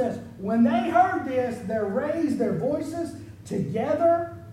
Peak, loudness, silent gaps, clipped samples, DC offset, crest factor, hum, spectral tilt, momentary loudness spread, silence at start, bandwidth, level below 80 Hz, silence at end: -8 dBFS; -25 LUFS; none; under 0.1%; under 0.1%; 18 dB; none; -7.5 dB/octave; 11 LU; 0 s; 13 kHz; -58 dBFS; 0 s